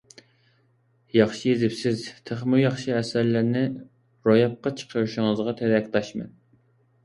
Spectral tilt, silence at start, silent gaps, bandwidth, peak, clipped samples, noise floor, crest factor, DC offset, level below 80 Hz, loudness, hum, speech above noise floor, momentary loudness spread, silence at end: -6.5 dB/octave; 1.15 s; none; 11.5 kHz; -6 dBFS; under 0.1%; -64 dBFS; 20 dB; under 0.1%; -62 dBFS; -24 LUFS; none; 41 dB; 10 LU; 0.75 s